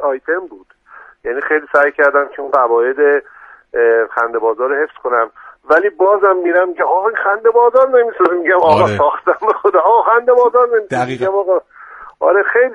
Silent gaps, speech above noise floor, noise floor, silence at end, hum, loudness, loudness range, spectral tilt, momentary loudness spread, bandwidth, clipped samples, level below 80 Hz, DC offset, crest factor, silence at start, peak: none; 28 dB; -41 dBFS; 0 s; none; -13 LUFS; 3 LU; -6.5 dB/octave; 7 LU; 7.8 kHz; under 0.1%; -58 dBFS; under 0.1%; 14 dB; 0 s; 0 dBFS